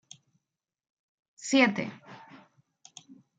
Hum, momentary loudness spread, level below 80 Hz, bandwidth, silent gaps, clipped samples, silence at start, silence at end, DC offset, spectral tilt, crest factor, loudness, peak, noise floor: none; 27 LU; -80 dBFS; 9.4 kHz; none; under 0.1%; 1.4 s; 0.25 s; under 0.1%; -3.5 dB/octave; 24 dB; -26 LUFS; -10 dBFS; -88 dBFS